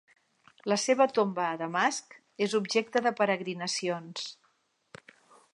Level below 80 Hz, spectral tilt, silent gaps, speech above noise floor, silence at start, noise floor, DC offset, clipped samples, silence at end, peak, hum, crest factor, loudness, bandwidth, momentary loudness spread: -82 dBFS; -3.5 dB/octave; none; 43 dB; 0.65 s; -72 dBFS; under 0.1%; under 0.1%; 1.2 s; -10 dBFS; none; 20 dB; -29 LUFS; 11.5 kHz; 13 LU